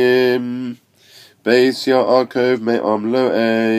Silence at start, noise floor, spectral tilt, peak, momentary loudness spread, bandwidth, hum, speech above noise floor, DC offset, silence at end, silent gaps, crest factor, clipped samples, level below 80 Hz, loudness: 0 s; -46 dBFS; -5.5 dB/octave; 0 dBFS; 11 LU; 14.5 kHz; none; 31 dB; under 0.1%; 0 s; none; 16 dB; under 0.1%; -70 dBFS; -16 LUFS